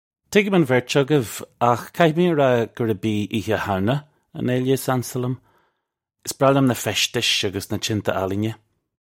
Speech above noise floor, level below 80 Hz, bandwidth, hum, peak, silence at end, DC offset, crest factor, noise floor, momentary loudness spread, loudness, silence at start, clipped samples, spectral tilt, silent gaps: 58 dB; -58 dBFS; 16.5 kHz; none; -2 dBFS; 0.5 s; under 0.1%; 20 dB; -78 dBFS; 11 LU; -21 LUFS; 0.3 s; under 0.1%; -5 dB/octave; none